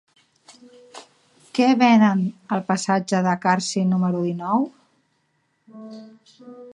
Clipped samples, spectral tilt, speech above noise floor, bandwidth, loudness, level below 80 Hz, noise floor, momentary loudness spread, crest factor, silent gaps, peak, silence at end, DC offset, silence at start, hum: under 0.1%; -5.5 dB/octave; 49 dB; 10.5 kHz; -20 LUFS; -72 dBFS; -69 dBFS; 25 LU; 18 dB; none; -4 dBFS; 0.05 s; under 0.1%; 0.95 s; none